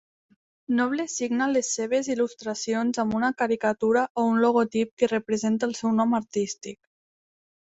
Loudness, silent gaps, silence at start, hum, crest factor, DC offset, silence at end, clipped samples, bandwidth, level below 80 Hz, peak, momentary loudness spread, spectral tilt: -25 LUFS; 4.10-4.15 s, 4.91-4.97 s; 0.7 s; none; 18 dB; under 0.1%; 1 s; under 0.1%; 8.2 kHz; -66 dBFS; -8 dBFS; 6 LU; -4 dB/octave